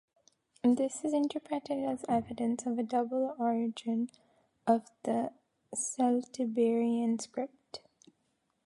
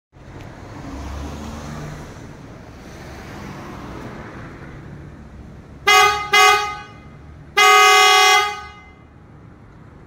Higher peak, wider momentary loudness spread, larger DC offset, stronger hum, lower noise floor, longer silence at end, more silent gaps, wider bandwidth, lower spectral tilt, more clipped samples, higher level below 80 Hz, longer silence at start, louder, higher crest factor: second, -14 dBFS vs 0 dBFS; second, 11 LU vs 27 LU; neither; neither; first, -78 dBFS vs -44 dBFS; second, 0.9 s vs 1.4 s; neither; second, 11.5 kHz vs 16.5 kHz; first, -5 dB/octave vs -1 dB/octave; neither; second, -74 dBFS vs -42 dBFS; first, 0.65 s vs 0.3 s; second, -33 LUFS vs -12 LUFS; about the same, 20 dB vs 20 dB